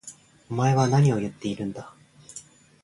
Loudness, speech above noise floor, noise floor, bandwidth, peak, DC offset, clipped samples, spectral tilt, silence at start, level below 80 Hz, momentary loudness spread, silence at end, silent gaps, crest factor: -24 LUFS; 25 dB; -48 dBFS; 11.5 kHz; -10 dBFS; under 0.1%; under 0.1%; -6.5 dB/octave; 0.05 s; -60 dBFS; 22 LU; 0.45 s; none; 16 dB